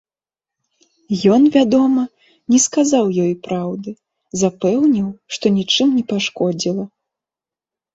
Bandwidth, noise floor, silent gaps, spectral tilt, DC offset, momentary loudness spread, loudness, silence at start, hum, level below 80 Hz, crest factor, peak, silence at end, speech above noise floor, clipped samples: 8 kHz; -89 dBFS; none; -4.5 dB/octave; under 0.1%; 14 LU; -16 LUFS; 1.1 s; none; -58 dBFS; 16 dB; -2 dBFS; 1.1 s; 74 dB; under 0.1%